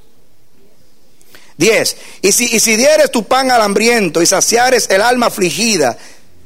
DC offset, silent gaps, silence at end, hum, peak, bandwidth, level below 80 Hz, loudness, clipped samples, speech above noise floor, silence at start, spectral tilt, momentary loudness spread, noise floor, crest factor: 2%; none; 0.5 s; none; 0 dBFS; 16.5 kHz; -52 dBFS; -11 LUFS; under 0.1%; 41 dB; 1.6 s; -2 dB/octave; 5 LU; -52 dBFS; 14 dB